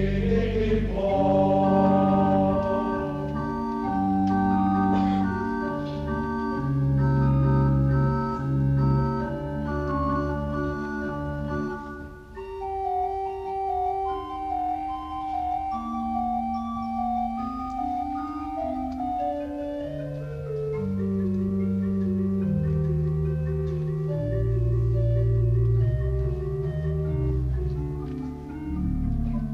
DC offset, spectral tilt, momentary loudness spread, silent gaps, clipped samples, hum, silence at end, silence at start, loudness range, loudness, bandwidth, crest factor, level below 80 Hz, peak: under 0.1%; -10 dB/octave; 10 LU; none; under 0.1%; none; 0 s; 0 s; 7 LU; -26 LUFS; 6.6 kHz; 16 dB; -36 dBFS; -10 dBFS